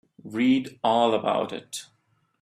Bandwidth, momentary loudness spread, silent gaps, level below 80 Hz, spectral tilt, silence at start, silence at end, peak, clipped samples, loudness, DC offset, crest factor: 14 kHz; 14 LU; none; -70 dBFS; -4.5 dB/octave; 0.25 s; 0.55 s; -8 dBFS; under 0.1%; -24 LUFS; under 0.1%; 16 dB